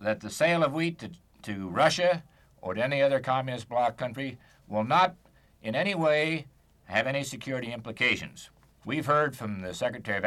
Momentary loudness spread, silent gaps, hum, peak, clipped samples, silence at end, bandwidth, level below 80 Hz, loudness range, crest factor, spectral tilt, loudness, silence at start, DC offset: 14 LU; none; none; -10 dBFS; under 0.1%; 0 s; 14 kHz; -64 dBFS; 2 LU; 18 dB; -5 dB/octave; -28 LUFS; 0 s; under 0.1%